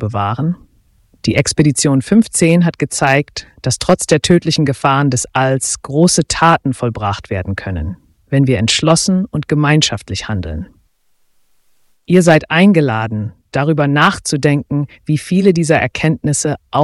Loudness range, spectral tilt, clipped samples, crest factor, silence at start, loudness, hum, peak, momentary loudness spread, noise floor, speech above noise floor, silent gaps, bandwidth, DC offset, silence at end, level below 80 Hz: 3 LU; -5 dB/octave; under 0.1%; 14 dB; 0 s; -14 LUFS; none; 0 dBFS; 10 LU; -57 dBFS; 43 dB; none; 12 kHz; under 0.1%; 0 s; -40 dBFS